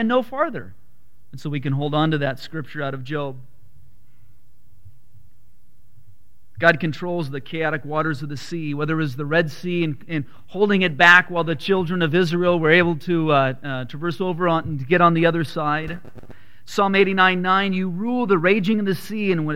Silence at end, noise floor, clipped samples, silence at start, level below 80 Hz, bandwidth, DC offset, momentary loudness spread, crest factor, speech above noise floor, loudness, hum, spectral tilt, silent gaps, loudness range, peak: 0 s; -59 dBFS; under 0.1%; 0 s; -56 dBFS; 16 kHz; 2%; 13 LU; 22 dB; 39 dB; -20 LUFS; none; -6.5 dB/octave; none; 10 LU; 0 dBFS